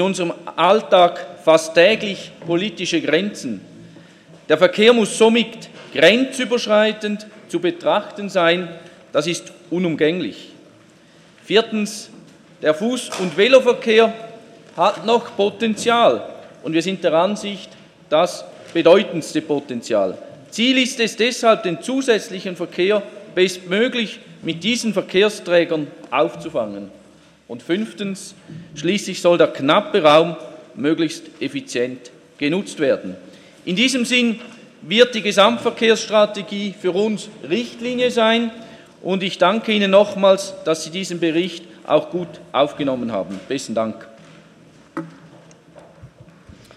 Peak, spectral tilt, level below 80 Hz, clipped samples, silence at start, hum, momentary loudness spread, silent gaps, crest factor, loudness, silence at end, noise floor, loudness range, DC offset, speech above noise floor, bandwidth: 0 dBFS; -4 dB/octave; -66 dBFS; under 0.1%; 0 s; none; 16 LU; none; 18 dB; -18 LUFS; 0.7 s; -49 dBFS; 6 LU; under 0.1%; 31 dB; 14 kHz